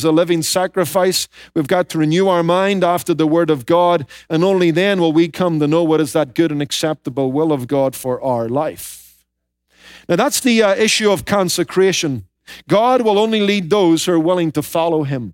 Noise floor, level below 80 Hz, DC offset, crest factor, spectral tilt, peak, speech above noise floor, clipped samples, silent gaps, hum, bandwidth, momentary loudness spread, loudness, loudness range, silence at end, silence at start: -70 dBFS; -56 dBFS; under 0.1%; 12 dB; -4.5 dB/octave; -2 dBFS; 55 dB; under 0.1%; none; none; 17 kHz; 7 LU; -16 LUFS; 4 LU; 0 s; 0 s